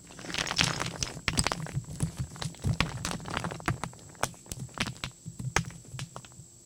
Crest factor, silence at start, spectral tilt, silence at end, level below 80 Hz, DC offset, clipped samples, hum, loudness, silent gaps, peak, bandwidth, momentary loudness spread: 30 dB; 0 s; -3.5 dB/octave; 0 s; -48 dBFS; under 0.1%; under 0.1%; none; -33 LUFS; none; -4 dBFS; 18 kHz; 13 LU